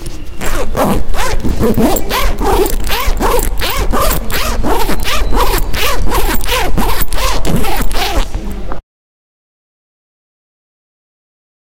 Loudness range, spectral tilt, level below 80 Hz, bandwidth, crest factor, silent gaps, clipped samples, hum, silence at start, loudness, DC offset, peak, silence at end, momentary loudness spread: 8 LU; -4 dB/octave; -18 dBFS; 16.5 kHz; 10 dB; none; under 0.1%; none; 0 s; -15 LUFS; under 0.1%; 0 dBFS; 2.95 s; 7 LU